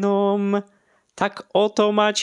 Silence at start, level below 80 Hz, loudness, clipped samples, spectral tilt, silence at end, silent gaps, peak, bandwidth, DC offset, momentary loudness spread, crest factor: 0 s; -70 dBFS; -21 LUFS; under 0.1%; -4.5 dB/octave; 0 s; none; -4 dBFS; 10 kHz; under 0.1%; 8 LU; 16 dB